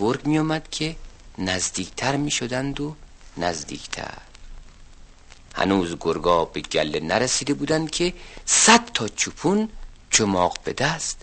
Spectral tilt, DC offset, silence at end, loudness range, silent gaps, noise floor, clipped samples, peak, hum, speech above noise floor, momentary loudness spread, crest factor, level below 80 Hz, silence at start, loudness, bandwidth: -3 dB/octave; under 0.1%; 0 s; 9 LU; none; -46 dBFS; under 0.1%; 0 dBFS; none; 23 dB; 14 LU; 24 dB; -44 dBFS; 0 s; -22 LUFS; 8.8 kHz